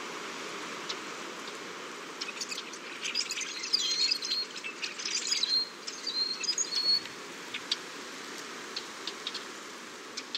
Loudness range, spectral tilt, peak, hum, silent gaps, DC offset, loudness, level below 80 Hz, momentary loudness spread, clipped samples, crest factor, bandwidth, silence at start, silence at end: 7 LU; 0.5 dB/octave; -14 dBFS; none; none; under 0.1%; -32 LUFS; -88 dBFS; 14 LU; under 0.1%; 22 dB; 16 kHz; 0 s; 0 s